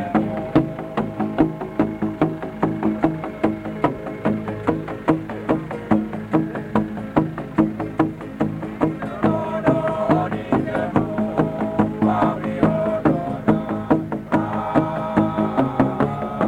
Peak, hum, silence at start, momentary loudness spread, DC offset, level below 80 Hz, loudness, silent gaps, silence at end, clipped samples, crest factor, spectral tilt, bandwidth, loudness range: -2 dBFS; none; 0 s; 4 LU; under 0.1%; -46 dBFS; -22 LUFS; none; 0 s; under 0.1%; 20 dB; -9 dB/octave; 9.6 kHz; 3 LU